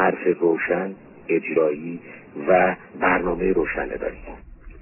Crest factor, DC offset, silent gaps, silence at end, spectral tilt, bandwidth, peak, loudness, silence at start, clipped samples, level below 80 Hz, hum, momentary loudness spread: 18 dB; under 0.1%; none; 0 s; -10.5 dB/octave; 3 kHz; -6 dBFS; -22 LUFS; 0 s; under 0.1%; -46 dBFS; none; 18 LU